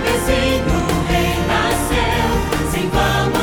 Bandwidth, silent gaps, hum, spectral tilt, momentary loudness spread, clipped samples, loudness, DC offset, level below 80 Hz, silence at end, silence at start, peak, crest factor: over 20 kHz; none; none; -4.5 dB/octave; 2 LU; under 0.1%; -17 LUFS; under 0.1%; -24 dBFS; 0 s; 0 s; -2 dBFS; 14 dB